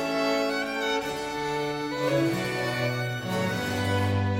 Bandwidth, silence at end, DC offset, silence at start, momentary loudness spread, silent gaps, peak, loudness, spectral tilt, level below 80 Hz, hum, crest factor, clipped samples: 16.5 kHz; 0 s; under 0.1%; 0 s; 4 LU; none; -14 dBFS; -27 LUFS; -5.5 dB/octave; -56 dBFS; none; 14 dB; under 0.1%